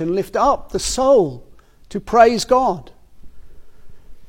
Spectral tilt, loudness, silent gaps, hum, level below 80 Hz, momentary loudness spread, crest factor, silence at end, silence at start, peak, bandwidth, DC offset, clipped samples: -4 dB/octave; -16 LUFS; none; none; -40 dBFS; 14 LU; 18 dB; 0 s; 0 s; 0 dBFS; 16.5 kHz; under 0.1%; under 0.1%